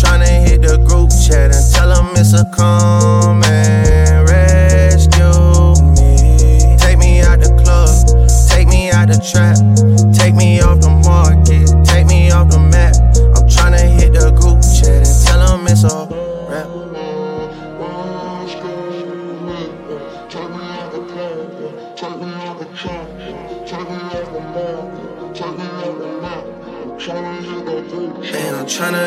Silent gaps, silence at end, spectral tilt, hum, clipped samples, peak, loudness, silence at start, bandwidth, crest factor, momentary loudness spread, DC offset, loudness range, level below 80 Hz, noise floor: none; 0 s; -5.5 dB/octave; none; under 0.1%; 0 dBFS; -10 LUFS; 0 s; 14.5 kHz; 10 dB; 18 LU; under 0.1%; 17 LU; -12 dBFS; -28 dBFS